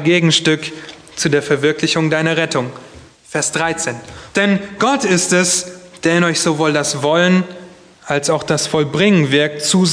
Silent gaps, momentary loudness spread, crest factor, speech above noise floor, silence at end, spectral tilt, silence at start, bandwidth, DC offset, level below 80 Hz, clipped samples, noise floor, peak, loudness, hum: none; 9 LU; 16 dB; 23 dB; 0 s; -4 dB/octave; 0 s; 11 kHz; under 0.1%; -54 dBFS; under 0.1%; -38 dBFS; 0 dBFS; -15 LUFS; none